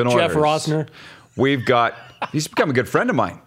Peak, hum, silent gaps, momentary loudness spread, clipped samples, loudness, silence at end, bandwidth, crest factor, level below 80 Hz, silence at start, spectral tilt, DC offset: -2 dBFS; none; none; 10 LU; under 0.1%; -19 LUFS; 0.1 s; 16 kHz; 18 dB; -58 dBFS; 0 s; -5.5 dB/octave; under 0.1%